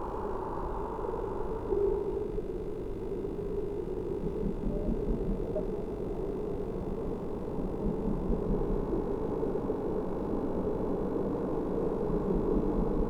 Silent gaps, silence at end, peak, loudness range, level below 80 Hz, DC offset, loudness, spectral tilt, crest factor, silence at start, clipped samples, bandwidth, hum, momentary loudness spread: none; 0 s; -16 dBFS; 3 LU; -38 dBFS; under 0.1%; -34 LUFS; -10 dB/octave; 16 dB; 0 s; under 0.1%; 7.4 kHz; none; 6 LU